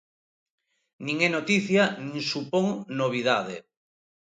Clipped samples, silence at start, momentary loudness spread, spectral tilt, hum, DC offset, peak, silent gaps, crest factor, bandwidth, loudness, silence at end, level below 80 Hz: under 0.1%; 1 s; 10 LU; -5 dB/octave; none; under 0.1%; -8 dBFS; none; 20 dB; 9.4 kHz; -25 LUFS; 0.75 s; -72 dBFS